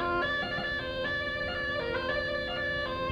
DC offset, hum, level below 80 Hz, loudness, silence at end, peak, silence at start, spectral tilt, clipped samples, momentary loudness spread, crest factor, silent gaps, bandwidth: under 0.1%; none; -48 dBFS; -31 LUFS; 0 s; -20 dBFS; 0 s; -5.5 dB/octave; under 0.1%; 2 LU; 12 dB; none; 13 kHz